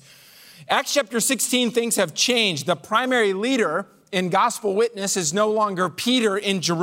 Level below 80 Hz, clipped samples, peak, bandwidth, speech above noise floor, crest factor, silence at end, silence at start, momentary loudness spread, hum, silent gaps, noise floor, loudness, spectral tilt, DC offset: -74 dBFS; under 0.1%; -6 dBFS; 16 kHz; 27 dB; 16 dB; 0 s; 0.6 s; 4 LU; none; none; -48 dBFS; -21 LUFS; -3 dB/octave; under 0.1%